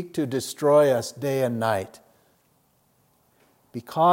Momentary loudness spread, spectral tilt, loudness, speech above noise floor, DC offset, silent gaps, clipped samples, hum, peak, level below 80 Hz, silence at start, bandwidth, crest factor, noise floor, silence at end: 19 LU; -5.5 dB/octave; -23 LUFS; 42 dB; under 0.1%; none; under 0.1%; none; -6 dBFS; -72 dBFS; 0 s; 17 kHz; 18 dB; -65 dBFS; 0 s